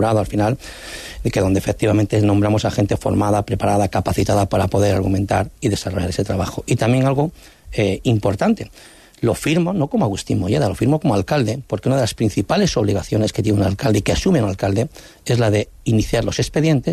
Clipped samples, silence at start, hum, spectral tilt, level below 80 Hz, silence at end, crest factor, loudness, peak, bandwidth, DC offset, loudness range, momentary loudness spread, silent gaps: under 0.1%; 0 s; none; -6.5 dB/octave; -38 dBFS; 0 s; 12 dB; -19 LUFS; -6 dBFS; 14 kHz; under 0.1%; 2 LU; 5 LU; none